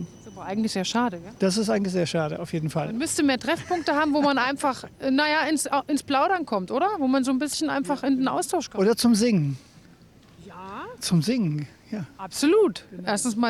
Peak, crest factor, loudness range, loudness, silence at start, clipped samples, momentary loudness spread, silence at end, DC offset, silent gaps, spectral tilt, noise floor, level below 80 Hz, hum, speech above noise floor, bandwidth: -12 dBFS; 12 dB; 3 LU; -24 LUFS; 0 s; under 0.1%; 12 LU; 0 s; under 0.1%; none; -4.5 dB/octave; -52 dBFS; -60 dBFS; none; 28 dB; 14.5 kHz